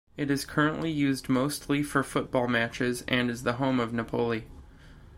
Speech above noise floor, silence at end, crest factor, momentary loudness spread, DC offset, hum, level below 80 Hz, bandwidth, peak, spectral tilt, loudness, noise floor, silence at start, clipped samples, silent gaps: 22 dB; 0 s; 18 dB; 4 LU; under 0.1%; none; -52 dBFS; 16.5 kHz; -10 dBFS; -5.5 dB/octave; -28 LUFS; -50 dBFS; 0.15 s; under 0.1%; none